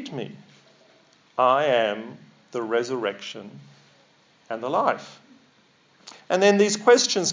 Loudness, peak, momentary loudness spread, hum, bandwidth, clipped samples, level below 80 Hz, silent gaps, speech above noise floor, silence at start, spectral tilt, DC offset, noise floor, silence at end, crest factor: -22 LUFS; -4 dBFS; 20 LU; none; 7.6 kHz; under 0.1%; -84 dBFS; none; 37 dB; 0 s; -3 dB/octave; under 0.1%; -60 dBFS; 0 s; 20 dB